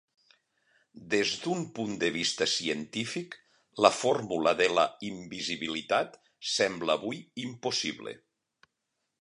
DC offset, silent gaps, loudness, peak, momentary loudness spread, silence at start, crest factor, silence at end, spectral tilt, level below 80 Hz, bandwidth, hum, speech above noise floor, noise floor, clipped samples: under 0.1%; none; -29 LUFS; -6 dBFS; 14 LU; 0.95 s; 26 dB; 1.05 s; -3 dB/octave; -70 dBFS; 11.5 kHz; none; 53 dB; -83 dBFS; under 0.1%